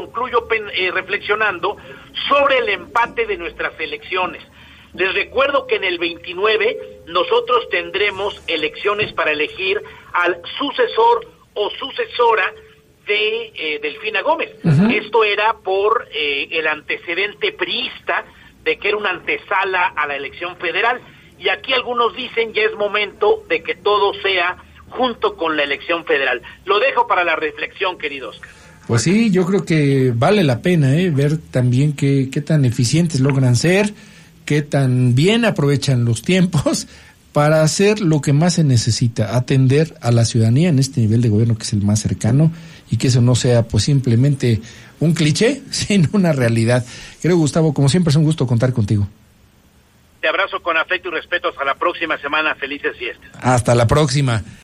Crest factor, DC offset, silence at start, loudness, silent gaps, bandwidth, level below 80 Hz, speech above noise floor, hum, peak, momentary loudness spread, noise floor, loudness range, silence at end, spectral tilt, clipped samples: 12 dB; under 0.1%; 0 s; -17 LUFS; none; 13 kHz; -48 dBFS; 35 dB; none; -4 dBFS; 8 LU; -51 dBFS; 4 LU; 0.05 s; -5.5 dB/octave; under 0.1%